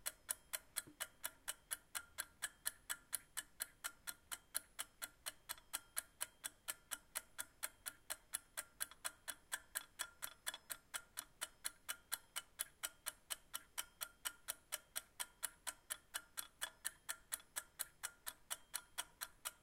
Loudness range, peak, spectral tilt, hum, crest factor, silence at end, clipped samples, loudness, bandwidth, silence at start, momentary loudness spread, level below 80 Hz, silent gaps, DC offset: 1 LU; -22 dBFS; 1.5 dB/octave; none; 30 dB; 0.05 s; under 0.1%; -48 LUFS; 16.5 kHz; 0 s; 5 LU; -76 dBFS; none; under 0.1%